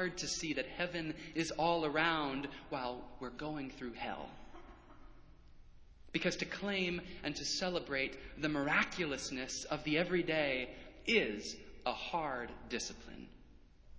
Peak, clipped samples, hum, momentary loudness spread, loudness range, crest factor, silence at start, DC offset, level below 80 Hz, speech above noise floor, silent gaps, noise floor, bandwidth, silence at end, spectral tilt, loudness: -16 dBFS; under 0.1%; none; 13 LU; 8 LU; 24 dB; 0 s; under 0.1%; -60 dBFS; 22 dB; none; -60 dBFS; 8 kHz; 0 s; -3.5 dB/octave; -37 LUFS